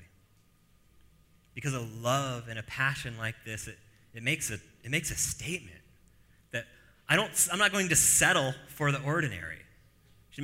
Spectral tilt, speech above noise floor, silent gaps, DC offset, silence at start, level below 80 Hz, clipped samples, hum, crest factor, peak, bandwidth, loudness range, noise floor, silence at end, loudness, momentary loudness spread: -2.5 dB/octave; 34 dB; none; under 0.1%; 0 s; -56 dBFS; under 0.1%; none; 24 dB; -8 dBFS; 16 kHz; 8 LU; -64 dBFS; 0 s; -29 LUFS; 18 LU